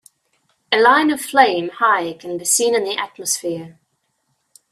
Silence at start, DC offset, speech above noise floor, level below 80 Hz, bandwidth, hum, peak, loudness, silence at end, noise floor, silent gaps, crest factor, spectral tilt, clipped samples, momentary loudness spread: 0.7 s; under 0.1%; 52 dB; -68 dBFS; 16 kHz; none; 0 dBFS; -17 LUFS; 1 s; -69 dBFS; none; 18 dB; -1.5 dB/octave; under 0.1%; 11 LU